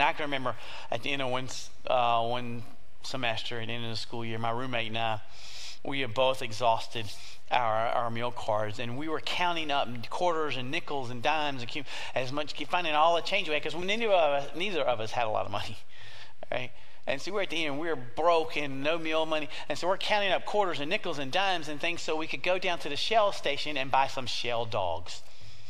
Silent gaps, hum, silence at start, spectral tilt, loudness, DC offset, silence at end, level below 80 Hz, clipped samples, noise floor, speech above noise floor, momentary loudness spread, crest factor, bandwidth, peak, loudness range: none; none; 0 s; -4 dB/octave; -30 LUFS; 3%; 0 s; -62 dBFS; under 0.1%; -51 dBFS; 20 dB; 12 LU; 22 dB; 15.5 kHz; -8 dBFS; 4 LU